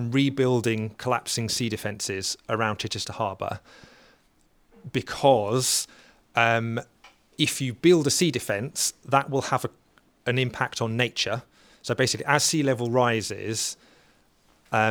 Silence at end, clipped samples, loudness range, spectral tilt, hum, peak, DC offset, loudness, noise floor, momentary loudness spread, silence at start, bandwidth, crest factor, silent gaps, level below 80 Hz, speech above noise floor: 0 s; under 0.1%; 5 LU; -4 dB/octave; none; -4 dBFS; under 0.1%; -25 LUFS; -63 dBFS; 11 LU; 0 s; over 20 kHz; 22 dB; none; -62 dBFS; 38 dB